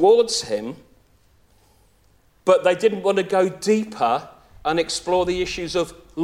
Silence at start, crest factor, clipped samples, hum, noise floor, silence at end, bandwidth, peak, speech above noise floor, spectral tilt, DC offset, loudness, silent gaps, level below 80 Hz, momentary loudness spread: 0 s; 18 dB; under 0.1%; none; -58 dBFS; 0 s; 15 kHz; -4 dBFS; 38 dB; -4 dB/octave; under 0.1%; -21 LUFS; none; -50 dBFS; 10 LU